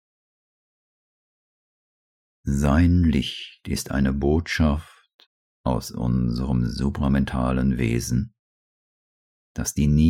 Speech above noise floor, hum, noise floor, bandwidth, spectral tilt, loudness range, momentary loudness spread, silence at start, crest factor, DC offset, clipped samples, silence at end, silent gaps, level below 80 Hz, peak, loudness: over 69 dB; none; under -90 dBFS; 16.5 kHz; -6 dB/octave; 3 LU; 11 LU; 2.45 s; 16 dB; under 0.1%; under 0.1%; 0 s; 5.14-5.19 s, 5.26-5.64 s, 8.39-9.55 s; -32 dBFS; -8 dBFS; -23 LUFS